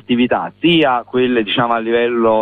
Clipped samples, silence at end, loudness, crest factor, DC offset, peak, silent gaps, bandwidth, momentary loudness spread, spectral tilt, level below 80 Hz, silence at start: under 0.1%; 0 s; -15 LUFS; 12 dB; under 0.1%; -2 dBFS; none; 4.4 kHz; 3 LU; -8 dB/octave; -52 dBFS; 0.1 s